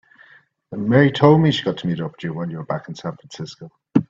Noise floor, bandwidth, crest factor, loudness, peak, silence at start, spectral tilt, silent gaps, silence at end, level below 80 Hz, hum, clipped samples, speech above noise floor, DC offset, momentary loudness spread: -52 dBFS; 7.6 kHz; 20 dB; -19 LUFS; 0 dBFS; 0.7 s; -7.5 dB/octave; none; 0.05 s; -58 dBFS; none; under 0.1%; 33 dB; under 0.1%; 20 LU